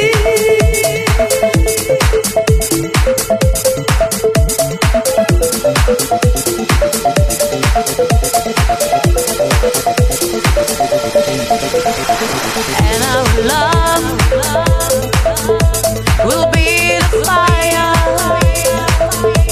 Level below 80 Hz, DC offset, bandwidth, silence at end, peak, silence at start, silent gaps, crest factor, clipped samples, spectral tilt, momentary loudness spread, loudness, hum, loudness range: -18 dBFS; under 0.1%; 15.5 kHz; 0 s; 0 dBFS; 0 s; none; 12 dB; under 0.1%; -4 dB/octave; 3 LU; -12 LUFS; none; 2 LU